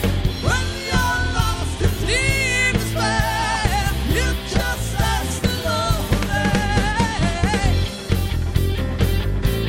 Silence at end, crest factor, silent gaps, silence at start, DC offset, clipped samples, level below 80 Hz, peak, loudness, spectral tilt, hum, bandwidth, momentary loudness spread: 0 s; 16 dB; none; 0 s; under 0.1%; under 0.1%; -26 dBFS; -4 dBFS; -20 LUFS; -4.5 dB/octave; none; 16.5 kHz; 4 LU